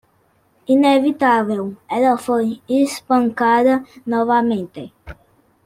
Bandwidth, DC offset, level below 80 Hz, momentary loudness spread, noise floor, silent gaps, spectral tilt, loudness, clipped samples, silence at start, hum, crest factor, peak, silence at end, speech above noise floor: 16 kHz; under 0.1%; -54 dBFS; 10 LU; -59 dBFS; none; -5.5 dB/octave; -17 LUFS; under 0.1%; 0.7 s; none; 16 dB; -2 dBFS; 0.55 s; 43 dB